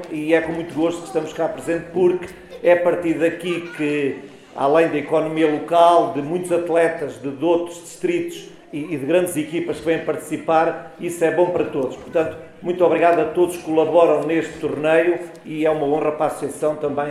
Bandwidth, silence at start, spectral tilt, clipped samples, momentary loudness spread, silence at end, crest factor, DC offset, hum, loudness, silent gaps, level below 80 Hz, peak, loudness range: 14 kHz; 0 s; -5.5 dB/octave; under 0.1%; 11 LU; 0 s; 18 dB; under 0.1%; none; -20 LUFS; none; -58 dBFS; -2 dBFS; 4 LU